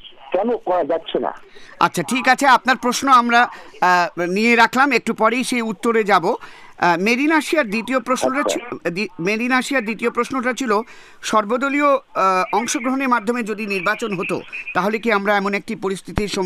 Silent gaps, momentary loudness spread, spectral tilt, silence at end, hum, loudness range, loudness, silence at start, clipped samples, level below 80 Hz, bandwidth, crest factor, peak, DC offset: none; 10 LU; -4 dB/octave; 0 s; none; 5 LU; -18 LUFS; 0.05 s; under 0.1%; -50 dBFS; 15.5 kHz; 16 dB; -2 dBFS; under 0.1%